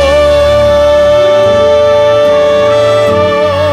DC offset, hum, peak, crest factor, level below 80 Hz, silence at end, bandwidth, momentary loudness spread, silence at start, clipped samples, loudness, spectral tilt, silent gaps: 0.2%; none; 0 dBFS; 6 dB; -26 dBFS; 0 s; 11.5 kHz; 2 LU; 0 s; under 0.1%; -7 LUFS; -5 dB/octave; none